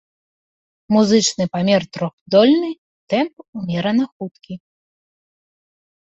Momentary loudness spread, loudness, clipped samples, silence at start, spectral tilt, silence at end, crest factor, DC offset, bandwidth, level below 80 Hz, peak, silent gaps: 19 LU; -18 LUFS; under 0.1%; 0.9 s; -5 dB/octave; 1.55 s; 18 dB; under 0.1%; 8.2 kHz; -60 dBFS; -2 dBFS; 2.13-2.26 s, 2.78-3.07 s, 3.33-3.37 s, 3.48-3.53 s, 4.12-4.20 s